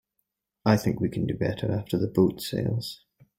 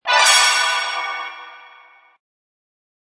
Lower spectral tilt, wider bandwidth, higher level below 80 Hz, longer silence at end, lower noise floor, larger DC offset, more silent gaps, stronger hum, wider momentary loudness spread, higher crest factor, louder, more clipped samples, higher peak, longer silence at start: first, -7 dB/octave vs 5 dB/octave; first, 16.5 kHz vs 11 kHz; first, -54 dBFS vs -84 dBFS; second, 0.45 s vs 1.5 s; first, -80 dBFS vs -48 dBFS; neither; neither; neither; second, 7 LU vs 20 LU; about the same, 20 dB vs 20 dB; second, -27 LUFS vs -14 LUFS; neither; second, -6 dBFS vs 0 dBFS; first, 0.65 s vs 0.05 s